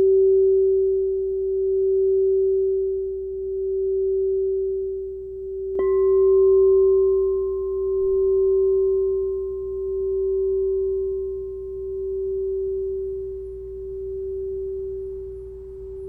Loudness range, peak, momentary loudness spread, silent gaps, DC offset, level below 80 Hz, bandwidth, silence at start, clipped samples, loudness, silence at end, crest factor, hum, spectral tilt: 9 LU; -12 dBFS; 15 LU; none; under 0.1%; -44 dBFS; 2.1 kHz; 0 s; under 0.1%; -22 LUFS; 0 s; 10 dB; none; -12 dB/octave